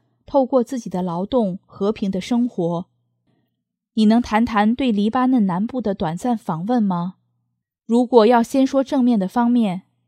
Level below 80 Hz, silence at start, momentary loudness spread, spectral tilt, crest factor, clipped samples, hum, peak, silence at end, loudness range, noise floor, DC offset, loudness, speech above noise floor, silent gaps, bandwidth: -52 dBFS; 0.3 s; 9 LU; -7 dB/octave; 18 dB; under 0.1%; none; 0 dBFS; 0.3 s; 4 LU; -76 dBFS; under 0.1%; -19 LUFS; 58 dB; none; 12.5 kHz